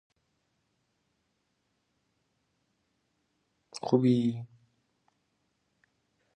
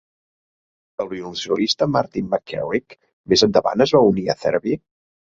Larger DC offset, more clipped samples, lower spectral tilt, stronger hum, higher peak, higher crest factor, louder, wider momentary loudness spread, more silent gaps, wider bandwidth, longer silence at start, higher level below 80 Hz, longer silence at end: neither; neither; first, -8 dB/octave vs -5 dB/octave; neither; second, -10 dBFS vs -2 dBFS; first, 26 dB vs 20 dB; second, -27 LUFS vs -20 LUFS; first, 18 LU vs 13 LU; second, none vs 3.13-3.24 s; first, 8.8 kHz vs 7.8 kHz; first, 3.75 s vs 1 s; second, -78 dBFS vs -54 dBFS; first, 1.9 s vs 0.65 s